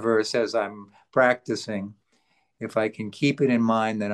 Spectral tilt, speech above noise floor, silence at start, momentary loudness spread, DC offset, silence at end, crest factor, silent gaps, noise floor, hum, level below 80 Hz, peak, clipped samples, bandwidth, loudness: -5.5 dB/octave; 44 dB; 0 s; 12 LU; under 0.1%; 0 s; 18 dB; none; -68 dBFS; none; -72 dBFS; -6 dBFS; under 0.1%; 11.5 kHz; -25 LUFS